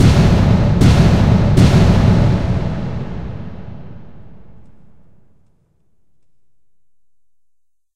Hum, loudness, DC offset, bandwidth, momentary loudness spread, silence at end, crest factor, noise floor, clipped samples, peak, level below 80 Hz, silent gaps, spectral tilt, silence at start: none; -13 LUFS; under 0.1%; 12 kHz; 20 LU; 0.4 s; 16 dB; -73 dBFS; under 0.1%; 0 dBFS; -24 dBFS; none; -7.5 dB/octave; 0 s